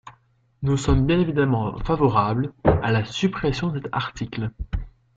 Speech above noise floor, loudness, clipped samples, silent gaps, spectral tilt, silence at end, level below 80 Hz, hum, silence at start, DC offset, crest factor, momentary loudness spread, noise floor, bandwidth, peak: 39 dB; -23 LUFS; under 0.1%; none; -7 dB/octave; 0.25 s; -34 dBFS; none; 0.05 s; under 0.1%; 20 dB; 10 LU; -60 dBFS; 7.8 kHz; -4 dBFS